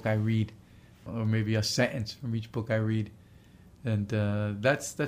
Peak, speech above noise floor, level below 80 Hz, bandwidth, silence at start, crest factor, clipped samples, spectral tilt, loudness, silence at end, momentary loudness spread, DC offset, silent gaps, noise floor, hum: -12 dBFS; 26 dB; -60 dBFS; 15.5 kHz; 0 s; 18 dB; under 0.1%; -5.5 dB/octave; -30 LUFS; 0 s; 9 LU; under 0.1%; none; -55 dBFS; none